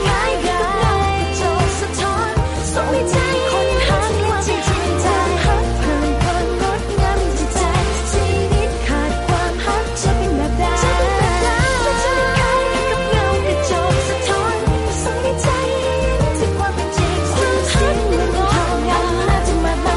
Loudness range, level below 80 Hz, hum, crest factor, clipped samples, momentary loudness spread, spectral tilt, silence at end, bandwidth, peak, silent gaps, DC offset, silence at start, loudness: 2 LU; -22 dBFS; none; 12 dB; under 0.1%; 3 LU; -5 dB/octave; 0 s; 11.5 kHz; -6 dBFS; none; under 0.1%; 0 s; -17 LUFS